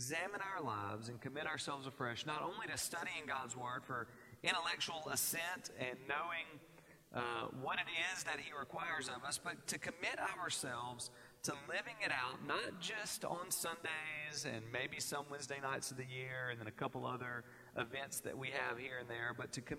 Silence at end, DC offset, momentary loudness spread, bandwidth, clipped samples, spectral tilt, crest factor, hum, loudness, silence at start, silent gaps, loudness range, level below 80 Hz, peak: 0 s; under 0.1%; 7 LU; 16 kHz; under 0.1%; -2.5 dB/octave; 24 dB; none; -43 LUFS; 0 s; none; 3 LU; -78 dBFS; -20 dBFS